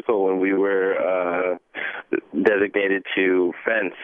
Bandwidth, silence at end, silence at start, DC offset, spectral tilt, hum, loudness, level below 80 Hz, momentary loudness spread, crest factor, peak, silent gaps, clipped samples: 4.1 kHz; 0 s; 0.05 s; under 0.1%; -7.5 dB/octave; none; -22 LUFS; -70 dBFS; 8 LU; 18 dB; -4 dBFS; none; under 0.1%